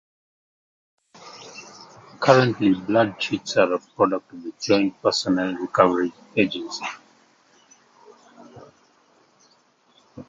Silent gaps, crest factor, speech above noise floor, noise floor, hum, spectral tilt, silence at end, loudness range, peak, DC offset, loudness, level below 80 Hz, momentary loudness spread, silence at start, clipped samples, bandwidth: none; 24 dB; 39 dB; -60 dBFS; none; -5 dB/octave; 0.05 s; 10 LU; 0 dBFS; under 0.1%; -22 LUFS; -64 dBFS; 22 LU; 1.25 s; under 0.1%; 7.8 kHz